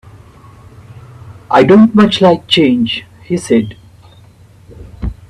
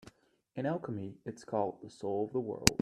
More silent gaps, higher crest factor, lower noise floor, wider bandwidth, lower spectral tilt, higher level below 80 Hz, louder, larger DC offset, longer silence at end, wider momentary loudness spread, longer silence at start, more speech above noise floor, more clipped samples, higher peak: neither; second, 14 dB vs 36 dB; second, -41 dBFS vs -61 dBFS; second, 11 kHz vs 15.5 kHz; first, -6 dB/octave vs -4 dB/octave; first, -36 dBFS vs -56 dBFS; first, -10 LUFS vs -36 LUFS; neither; about the same, 0.15 s vs 0.05 s; first, 17 LU vs 14 LU; first, 1.25 s vs 0.05 s; first, 32 dB vs 26 dB; neither; about the same, 0 dBFS vs 0 dBFS